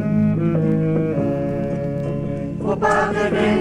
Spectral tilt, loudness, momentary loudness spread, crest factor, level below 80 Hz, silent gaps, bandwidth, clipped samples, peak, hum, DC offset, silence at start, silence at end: -8 dB/octave; -20 LUFS; 7 LU; 14 dB; -42 dBFS; none; 10 kHz; under 0.1%; -6 dBFS; none; under 0.1%; 0 s; 0 s